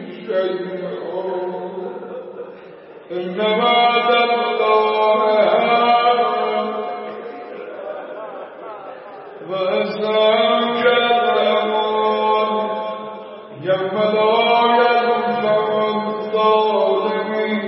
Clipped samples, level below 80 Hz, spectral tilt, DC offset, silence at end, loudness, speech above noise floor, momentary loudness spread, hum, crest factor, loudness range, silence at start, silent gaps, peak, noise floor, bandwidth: under 0.1%; -72 dBFS; -9.5 dB/octave; under 0.1%; 0 s; -17 LUFS; 20 dB; 18 LU; none; 16 dB; 10 LU; 0 s; none; -2 dBFS; -39 dBFS; 5.8 kHz